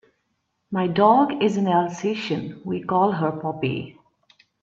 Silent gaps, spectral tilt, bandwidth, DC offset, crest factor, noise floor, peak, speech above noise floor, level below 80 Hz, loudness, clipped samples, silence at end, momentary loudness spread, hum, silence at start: none; -7 dB/octave; 7.6 kHz; under 0.1%; 20 dB; -74 dBFS; -4 dBFS; 52 dB; -64 dBFS; -22 LUFS; under 0.1%; 0.7 s; 13 LU; none; 0.7 s